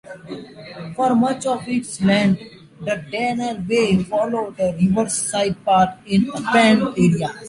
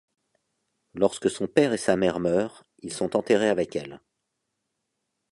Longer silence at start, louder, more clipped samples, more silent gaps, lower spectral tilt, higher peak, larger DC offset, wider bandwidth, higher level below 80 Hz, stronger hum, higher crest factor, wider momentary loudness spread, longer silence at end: second, 0.1 s vs 0.95 s; first, -19 LUFS vs -25 LUFS; neither; neither; about the same, -5 dB/octave vs -5 dB/octave; about the same, -2 dBFS vs -4 dBFS; neither; about the same, 11.5 kHz vs 11.5 kHz; first, -50 dBFS vs -60 dBFS; neither; about the same, 18 dB vs 22 dB; about the same, 16 LU vs 14 LU; second, 0 s vs 1.35 s